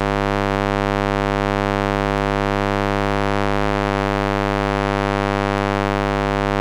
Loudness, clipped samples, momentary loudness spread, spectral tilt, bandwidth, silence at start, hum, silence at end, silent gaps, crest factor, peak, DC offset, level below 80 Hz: -20 LUFS; under 0.1%; 0 LU; -6.5 dB/octave; 15.5 kHz; 0 s; 50 Hz at -25 dBFS; 0 s; none; 16 dB; -4 dBFS; under 0.1%; -28 dBFS